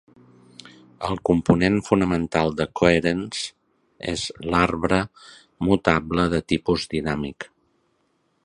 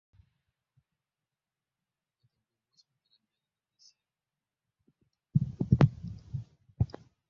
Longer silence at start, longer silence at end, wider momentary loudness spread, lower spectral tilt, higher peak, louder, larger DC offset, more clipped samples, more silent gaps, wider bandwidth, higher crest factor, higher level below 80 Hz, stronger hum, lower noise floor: second, 0.65 s vs 5.35 s; first, 1 s vs 0.45 s; second, 12 LU vs 17 LU; second, -6 dB/octave vs -9 dB/octave; first, 0 dBFS vs -8 dBFS; first, -22 LUFS vs -31 LUFS; neither; neither; neither; first, 11 kHz vs 6.6 kHz; second, 22 dB vs 28 dB; first, -44 dBFS vs -52 dBFS; neither; second, -68 dBFS vs under -90 dBFS